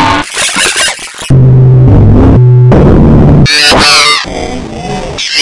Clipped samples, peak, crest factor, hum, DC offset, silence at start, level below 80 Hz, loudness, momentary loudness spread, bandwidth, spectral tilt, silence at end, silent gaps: 3%; 0 dBFS; 4 dB; none; under 0.1%; 0 s; -16 dBFS; -4 LUFS; 14 LU; 12 kHz; -4.5 dB/octave; 0 s; none